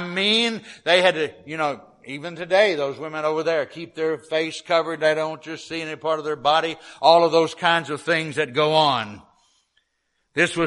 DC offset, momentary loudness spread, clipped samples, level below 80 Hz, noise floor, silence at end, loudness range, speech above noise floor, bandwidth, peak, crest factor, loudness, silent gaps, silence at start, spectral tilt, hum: under 0.1%; 13 LU; under 0.1%; -68 dBFS; -73 dBFS; 0 s; 4 LU; 51 dB; 11.5 kHz; 0 dBFS; 22 dB; -21 LUFS; none; 0 s; -4 dB/octave; none